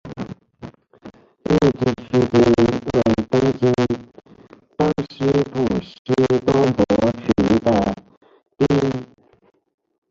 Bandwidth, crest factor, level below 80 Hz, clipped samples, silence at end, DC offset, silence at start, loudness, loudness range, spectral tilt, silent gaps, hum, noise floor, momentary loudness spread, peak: 7.6 kHz; 16 dB; -44 dBFS; under 0.1%; 1.05 s; under 0.1%; 0.05 s; -19 LUFS; 3 LU; -7.5 dB/octave; 5.99-6.05 s, 8.17-8.21 s; none; -47 dBFS; 13 LU; -4 dBFS